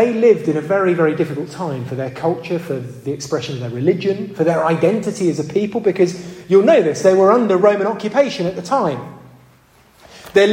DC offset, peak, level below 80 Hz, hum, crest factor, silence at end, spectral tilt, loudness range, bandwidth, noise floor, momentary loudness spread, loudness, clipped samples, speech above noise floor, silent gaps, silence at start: under 0.1%; 0 dBFS; -60 dBFS; none; 16 dB; 0 s; -6.5 dB/octave; 6 LU; 13 kHz; -50 dBFS; 12 LU; -17 LUFS; under 0.1%; 34 dB; none; 0 s